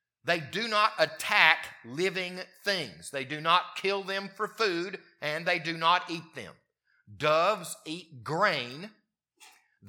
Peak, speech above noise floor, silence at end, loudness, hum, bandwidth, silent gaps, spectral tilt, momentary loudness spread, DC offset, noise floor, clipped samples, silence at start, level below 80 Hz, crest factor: -4 dBFS; 30 dB; 0 s; -28 LUFS; none; 19 kHz; none; -3 dB/octave; 14 LU; under 0.1%; -60 dBFS; under 0.1%; 0.25 s; -80 dBFS; 26 dB